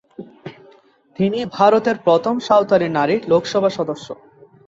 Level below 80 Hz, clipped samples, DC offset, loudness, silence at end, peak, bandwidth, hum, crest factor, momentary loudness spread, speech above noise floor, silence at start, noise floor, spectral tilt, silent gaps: -60 dBFS; under 0.1%; under 0.1%; -17 LUFS; 0.55 s; -2 dBFS; 7.8 kHz; none; 18 dB; 22 LU; 34 dB; 0.2 s; -51 dBFS; -6 dB/octave; none